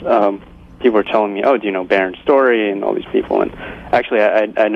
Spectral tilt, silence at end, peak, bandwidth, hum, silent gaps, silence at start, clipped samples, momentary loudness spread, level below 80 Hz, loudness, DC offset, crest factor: -7 dB/octave; 0 s; -2 dBFS; 6.4 kHz; none; none; 0 s; under 0.1%; 6 LU; -46 dBFS; -16 LUFS; under 0.1%; 14 dB